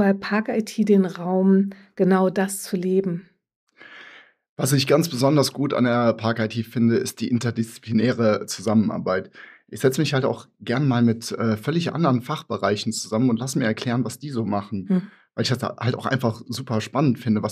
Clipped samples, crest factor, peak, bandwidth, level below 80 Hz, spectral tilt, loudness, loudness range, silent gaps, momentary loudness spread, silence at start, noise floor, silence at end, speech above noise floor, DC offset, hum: under 0.1%; 16 dB; -6 dBFS; 15.5 kHz; -70 dBFS; -6 dB/octave; -22 LUFS; 3 LU; 3.56-3.67 s, 4.49-4.56 s; 8 LU; 0 s; -48 dBFS; 0 s; 26 dB; under 0.1%; none